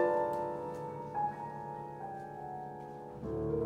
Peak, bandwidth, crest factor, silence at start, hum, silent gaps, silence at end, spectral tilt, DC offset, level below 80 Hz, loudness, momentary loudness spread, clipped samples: -20 dBFS; 15.5 kHz; 18 dB; 0 s; none; none; 0 s; -8.5 dB/octave; under 0.1%; -60 dBFS; -39 LUFS; 10 LU; under 0.1%